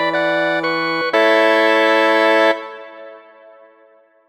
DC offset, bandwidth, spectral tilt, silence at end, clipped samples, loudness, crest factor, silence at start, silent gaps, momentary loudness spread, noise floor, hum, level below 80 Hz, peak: under 0.1%; 19 kHz; -4 dB/octave; 1.1 s; under 0.1%; -15 LUFS; 14 dB; 0 s; none; 13 LU; -51 dBFS; none; -76 dBFS; -2 dBFS